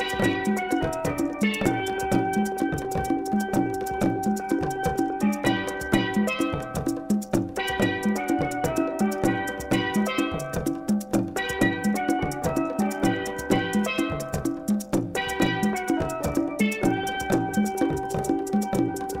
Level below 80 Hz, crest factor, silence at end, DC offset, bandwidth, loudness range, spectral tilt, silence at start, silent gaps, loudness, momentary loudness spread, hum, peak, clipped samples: -46 dBFS; 18 dB; 0 s; under 0.1%; 16 kHz; 1 LU; -5.5 dB/octave; 0 s; none; -26 LUFS; 4 LU; none; -6 dBFS; under 0.1%